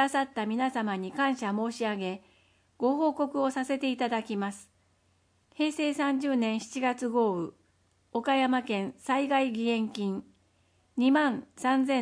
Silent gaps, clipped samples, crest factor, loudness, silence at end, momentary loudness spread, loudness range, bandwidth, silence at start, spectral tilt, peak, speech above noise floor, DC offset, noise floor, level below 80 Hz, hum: none; under 0.1%; 18 dB; -29 LUFS; 0 s; 8 LU; 2 LU; 10.5 kHz; 0 s; -5 dB/octave; -12 dBFS; 40 dB; under 0.1%; -69 dBFS; -76 dBFS; none